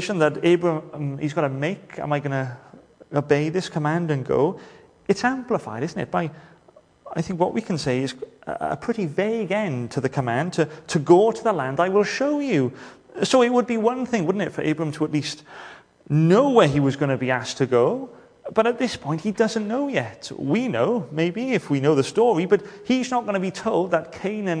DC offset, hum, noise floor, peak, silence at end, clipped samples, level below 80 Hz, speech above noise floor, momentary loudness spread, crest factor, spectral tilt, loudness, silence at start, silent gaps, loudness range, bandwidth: under 0.1%; none; -54 dBFS; -2 dBFS; 0 s; under 0.1%; -60 dBFS; 32 dB; 12 LU; 22 dB; -6 dB/octave; -23 LUFS; 0 s; none; 5 LU; 10.5 kHz